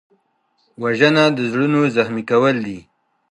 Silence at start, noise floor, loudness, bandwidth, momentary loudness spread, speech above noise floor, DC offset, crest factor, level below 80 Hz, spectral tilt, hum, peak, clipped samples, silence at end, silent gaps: 0.8 s; -65 dBFS; -17 LUFS; 11 kHz; 12 LU; 48 dB; under 0.1%; 18 dB; -62 dBFS; -6 dB/octave; none; -2 dBFS; under 0.1%; 0.5 s; none